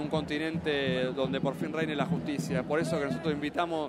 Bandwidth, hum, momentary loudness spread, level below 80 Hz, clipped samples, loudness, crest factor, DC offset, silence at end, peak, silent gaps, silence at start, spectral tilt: 14.5 kHz; none; 3 LU; -58 dBFS; under 0.1%; -31 LUFS; 18 dB; under 0.1%; 0 s; -12 dBFS; none; 0 s; -6 dB/octave